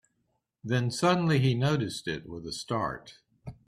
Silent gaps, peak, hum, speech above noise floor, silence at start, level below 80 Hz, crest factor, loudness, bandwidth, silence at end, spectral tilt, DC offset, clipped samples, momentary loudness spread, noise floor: none; -12 dBFS; none; 49 dB; 0.65 s; -58 dBFS; 18 dB; -29 LUFS; 13 kHz; 0.15 s; -6 dB/octave; under 0.1%; under 0.1%; 19 LU; -77 dBFS